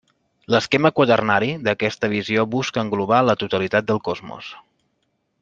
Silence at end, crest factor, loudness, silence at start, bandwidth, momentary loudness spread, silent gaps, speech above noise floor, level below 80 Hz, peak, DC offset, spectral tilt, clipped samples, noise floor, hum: 0.8 s; 20 dB; -20 LUFS; 0.5 s; 8 kHz; 11 LU; none; 51 dB; -60 dBFS; -2 dBFS; under 0.1%; -5.5 dB/octave; under 0.1%; -71 dBFS; none